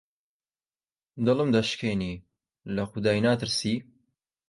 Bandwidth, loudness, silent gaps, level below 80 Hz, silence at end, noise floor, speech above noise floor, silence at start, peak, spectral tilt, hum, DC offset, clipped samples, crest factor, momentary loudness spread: 11.5 kHz; -27 LUFS; none; -56 dBFS; 0.65 s; under -90 dBFS; over 64 dB; 1.15 s; -10 dBFS; -5.5 dB/octave; none; under 0.1%; under 0.1%; 20 dB; 11 LU